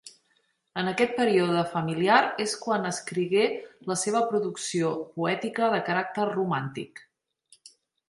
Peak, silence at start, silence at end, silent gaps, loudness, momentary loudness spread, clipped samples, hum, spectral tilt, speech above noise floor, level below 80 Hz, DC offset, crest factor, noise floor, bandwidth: -6 dBFS; 0.05 s; 1.1 s; none; -26 LUFS; 9 LU; under 0.1%; none; -4.5 dB/octave; 45 dB; -72 dBFS; under 0.1%; 22 dB; -71 dBFS; 11.5 kHz